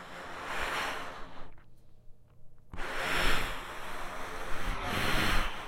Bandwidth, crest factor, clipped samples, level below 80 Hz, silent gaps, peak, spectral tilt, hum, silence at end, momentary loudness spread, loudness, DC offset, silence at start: 16 kHz; 18 dB; under 0.1%; -40 dBFS; none; -14 dBFS; -3 dB/octave; none; 0 s; 14 LU; -34 LUFS; under 0.1%; 0 s